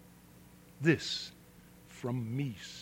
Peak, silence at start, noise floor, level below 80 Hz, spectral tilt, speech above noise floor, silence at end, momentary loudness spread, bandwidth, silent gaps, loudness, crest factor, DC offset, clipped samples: -14 dBFS; 0 s; -57 dBFS; -66 dBFS; -5.5 dB/octave; 24 dB; 0 s; 14 LU; 16.5 kHz; none; -35 LUFS; 24 dB; under 0.1%; under 0.1%